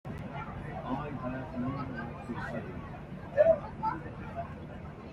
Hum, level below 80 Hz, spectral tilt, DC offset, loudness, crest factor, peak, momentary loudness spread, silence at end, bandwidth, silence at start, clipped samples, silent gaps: none; -52 dBFS; -8.5 dB/octave; under 0.1%; -35 LUFS; 22 dB; -12 dBFS; 17 LU; 0 s; 8.2 kHz; 0.05 s; under 0.1%; none